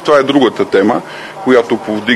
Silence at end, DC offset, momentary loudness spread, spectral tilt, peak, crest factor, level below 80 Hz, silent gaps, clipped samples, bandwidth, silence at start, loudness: 0 s; under 0.1%; 9 LU; -5.5 dB/octave; 0 dBFS; 12 dB; -54 dBFS; none; 0.3%; 12.5 kHz; 0 s; -12 LUFS